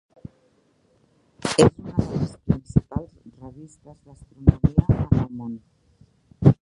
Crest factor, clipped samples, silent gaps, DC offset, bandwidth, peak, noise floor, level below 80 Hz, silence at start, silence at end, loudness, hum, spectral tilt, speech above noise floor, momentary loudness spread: 22 dB; under 0.1%; none; under 0.1%; 11.5 kHz; 0 dBFS; -63 dBFS; -36 dBFS; 1.45 s; 0.1 s; -22 LUFS; none; -7 dB/octave; 41 dB; 24 LU